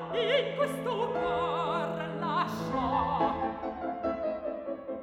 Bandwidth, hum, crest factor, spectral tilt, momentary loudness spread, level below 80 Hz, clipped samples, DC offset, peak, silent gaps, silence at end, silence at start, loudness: 17 kHz; none; 16 dB; -6 dB/octave; 8 LU; -54 dBFS; under 0.1%; under 0.1%; -16 dBFS; none; 0 s; 0 s; -31 LUFS